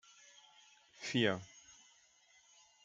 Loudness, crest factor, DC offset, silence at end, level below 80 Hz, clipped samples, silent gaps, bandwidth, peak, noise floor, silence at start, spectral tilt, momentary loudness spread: -37 LUFS; 24 dB; under 0.1%; 1.15 s; -84 dBFS; under 0.1%; none; 9.4 kHz; -18 dBFS; -68 dBFS; 1 s; -4.5 dB/octave; 27 LU